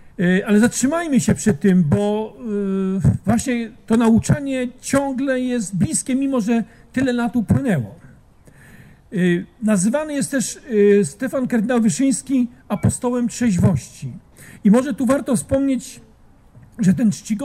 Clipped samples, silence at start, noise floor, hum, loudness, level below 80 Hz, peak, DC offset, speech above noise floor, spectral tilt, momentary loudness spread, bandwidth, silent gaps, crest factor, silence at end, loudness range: under 0.1%; 0 s; -49 dBFS; none; -19 LUFS; -44 dBFS; -2 dBFS; under 0.1%; 31 dB; -6 dB/octave; 8 LU; 14.5 kHz; none; 16 dB; 0 s; 3 LU